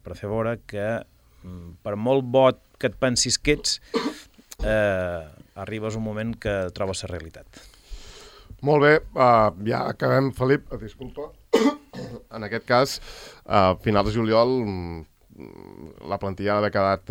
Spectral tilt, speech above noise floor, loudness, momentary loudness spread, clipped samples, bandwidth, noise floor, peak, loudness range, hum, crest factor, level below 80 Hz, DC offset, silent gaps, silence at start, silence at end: -4.5 dB/octave; 21 dB; -23 LUFS; 22 LU; under 0.1%; 16.5 kHz; -45 dBFS; -4 dBFS; 6 LU; none; 20 dB; -44 dBFS; under 0.1%; none; 0.05 s; 0.1 s